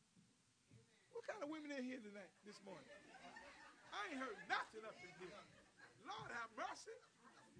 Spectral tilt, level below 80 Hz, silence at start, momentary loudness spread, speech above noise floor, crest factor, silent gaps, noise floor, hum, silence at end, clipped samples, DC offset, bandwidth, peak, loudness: -3.5 dB/octave; -88 dBFS; 0.15 s; 17 LU; 25 dB; 26 dB; none; -77 dBFS; none; 0 s; under 0.1%; under 0.1%; 10 kHz; -28 dBFS; -52 LUFS